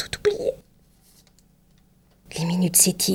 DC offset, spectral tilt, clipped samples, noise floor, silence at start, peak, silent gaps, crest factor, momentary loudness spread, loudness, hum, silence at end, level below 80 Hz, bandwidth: under 0.1%; -3.5 dB/octave; under 0.1%; -58 dBFS; 0 s; -4 dBFS; none; 22 dB; 18 LU; -21 LUFS; 50 Hz at -60 dBFS; 0 s; -54 dBFS; 17.5 kHz